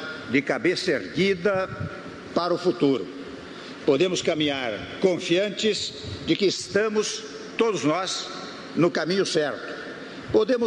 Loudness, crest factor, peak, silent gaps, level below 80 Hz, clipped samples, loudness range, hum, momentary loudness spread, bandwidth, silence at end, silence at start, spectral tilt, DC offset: -25 LUFS; 16 dB; -8 dBFS; none; -58 dBFS; under 0.1%; 2 LU; none; 12 LU; 10.5 kHz; 0 s; 0 s; -4.5 dB/octave; under 0.1%